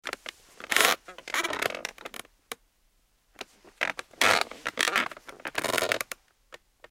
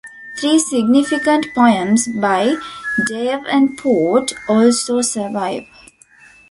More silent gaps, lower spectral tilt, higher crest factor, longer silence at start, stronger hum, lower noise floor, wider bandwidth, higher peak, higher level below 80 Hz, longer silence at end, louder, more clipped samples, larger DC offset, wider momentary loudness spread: neither; second, -0.5 dB/octave vs -3.5 dB/octave; first, 30 dB vs 14 dB; about the same, 0.05 s vs 0.05 s; neither; first, -68 dBFS vs -47 dBFS; first, 17 kHz vs 11.5 kHz; about the same, -2 dBFS vs -2 dBFS; second, -66 dBFS vs -56 dBFS; second, 0.35 s vs 0.85 s; second, -27 LUFS vs -16 LUFS; neither; neither; first, 21 LU vs 8 LU